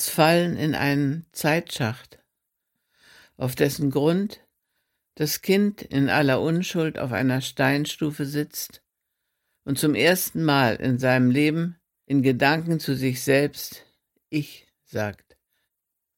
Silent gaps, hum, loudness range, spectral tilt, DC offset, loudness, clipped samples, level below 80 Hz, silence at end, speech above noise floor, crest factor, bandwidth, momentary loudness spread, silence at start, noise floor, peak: none; none; 6 LU; -5 dB/octave; under 0.1%; -23 LUFS; under 0.1%; -60 dBFS; 1 s; 59 dB; 20 dB; 17 kHz; 11 LU; 0 s; -82 dBFS; -4 dBFS